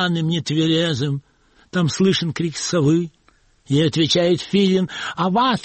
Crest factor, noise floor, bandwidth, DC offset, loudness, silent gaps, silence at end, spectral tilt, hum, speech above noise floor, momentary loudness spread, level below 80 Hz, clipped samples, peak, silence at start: 14 dB; -57 dBFS; 8.8 kHz; under 0.1%; -19 LUFS; none; 0 s; -5.5 dB/octave; none; 39 dB; 7 LU; -54 dBFS; under 0.1%; -4 dBFS; 0 s